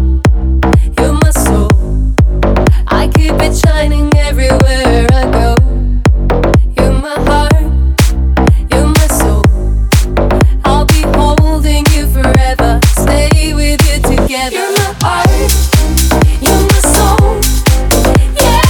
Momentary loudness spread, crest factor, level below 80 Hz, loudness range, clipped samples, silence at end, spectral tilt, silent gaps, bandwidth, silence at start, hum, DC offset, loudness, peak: 3 LU; 8 dB; -10 dBFS; 1 LU; under 0.1%; 0 s; -5 dB/octave; none; 20 kHz; 0 s; none; under 0.1%; -10 LUFS; 0 dBFS